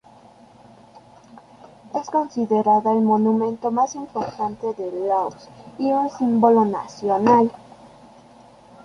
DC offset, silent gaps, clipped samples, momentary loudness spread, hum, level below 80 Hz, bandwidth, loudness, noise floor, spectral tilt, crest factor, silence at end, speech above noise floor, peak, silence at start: under 0.1%; none; under 0.1%; 12 LU; none; -64 dBFS; 7.2 kHz; -21 LUFS; -49 dBFS; -7 dB/octave; 20 dB; 1.3 s; 29 dB; -2 dBFS; 1.85 s